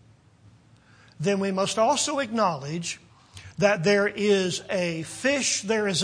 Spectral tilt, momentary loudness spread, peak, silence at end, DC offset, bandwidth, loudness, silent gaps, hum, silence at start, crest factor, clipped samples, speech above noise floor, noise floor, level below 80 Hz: -3.5 dB/octave; 9 LU; -6 dBFS; 0 s; under 0.1%; 10.5 kHz; -24 LUFS; none; none; 1.2 s; 20 dB; under 0.1%; 31 dB; -55 dBFS; -64 dBFS